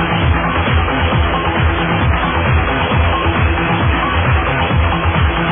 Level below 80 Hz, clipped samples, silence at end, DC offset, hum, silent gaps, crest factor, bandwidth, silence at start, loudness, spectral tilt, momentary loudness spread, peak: -20 dBFS; under 0.1%; 0 s; under 0.1%; none; none; 12 dB; 3.7 kHz; 0 s; -14 LUFS; -10 dB/octave; 1 LU; -2 dBFS